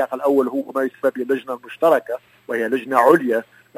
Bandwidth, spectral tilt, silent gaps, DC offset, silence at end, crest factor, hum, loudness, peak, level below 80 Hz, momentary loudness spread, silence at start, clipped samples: 16 kHz; -6 dB/octave; none; under 0.1%; 0.35 s; 20 dB; none; -19 LUFS; 0 dBFS; -76 dBFS; 12 LU; 0 s; under 0.1%